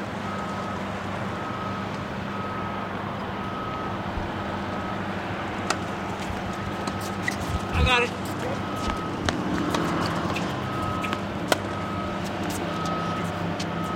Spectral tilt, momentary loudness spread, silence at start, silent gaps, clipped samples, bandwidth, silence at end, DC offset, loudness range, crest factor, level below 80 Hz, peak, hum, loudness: -5 dB/octave; 5 LU; 0 s; none; under 0.1%; 16 kHz; 0 s; under 0.1%; 5 LU; 28 dB; -42 dBFS; 0 dBFS; none; -28 LUFS